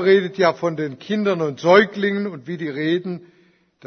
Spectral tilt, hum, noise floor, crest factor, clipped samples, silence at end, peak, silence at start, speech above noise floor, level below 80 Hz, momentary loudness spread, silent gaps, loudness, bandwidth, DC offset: -6.5 dB/octave; none; -56 dBFS; 18 dB; under 0.1%; 0.7 s; -2 dBFS; 0 s; 37 dB; -66 dBFS; 13 LU; none; -20 LUFS; 6.6 kHz; under 0.1%